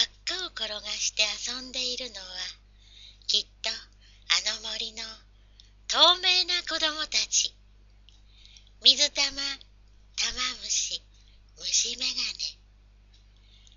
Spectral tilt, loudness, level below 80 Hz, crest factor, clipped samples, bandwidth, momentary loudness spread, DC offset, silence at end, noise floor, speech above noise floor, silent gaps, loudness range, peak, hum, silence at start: 2.5 dB/octave; -25 LUFS; -54 dBFS; 28 dB; under 0.1%; 7.6 kHz; 16 LU; under 0.1%; 1.25 s; -56 dBFS; 28 dB; none; 6 LU; -2 dBFS; 50 Hz at -55 dBFS; 0 s